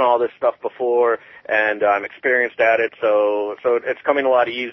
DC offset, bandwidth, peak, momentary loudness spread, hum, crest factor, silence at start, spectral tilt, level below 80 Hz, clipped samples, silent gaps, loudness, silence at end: under 0.1%; 6 kHz; -4 dBFS; 5 LU; none; 14 dB; 0 s; -5.5 dB/octave; -66 dBFS; under 0.1%; none; -19 LUFS; 0 s